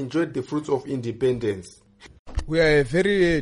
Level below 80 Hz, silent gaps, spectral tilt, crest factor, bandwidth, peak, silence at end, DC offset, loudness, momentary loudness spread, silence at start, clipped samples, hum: -38 dBFS; 2.19-2.25 s; -6.5 dB/octave; 14 dB; 11.5 kHz; -8 dBFS; 0 s; under 0.1%; -23 LUFS; 13 LU; 0 s; under 0.1%; none